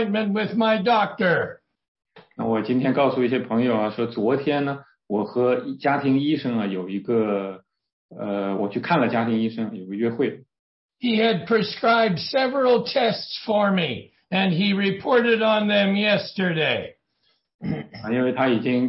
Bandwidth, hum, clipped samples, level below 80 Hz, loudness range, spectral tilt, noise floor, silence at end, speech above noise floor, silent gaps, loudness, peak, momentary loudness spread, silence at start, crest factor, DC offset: 5.8 kHz; none; under 0.1%; -66 dBFS; 4 LU; -10 dB/octave; -69 dBFS; 0 s; 47 dB; 1.88-1.95 s, 7.93-8.09 s, 10.59-10.89 s, 17.54-17.59 s; -22 LUFS; -6 dBFS; 10 LU; 0 s; 16 dB; under 0.1%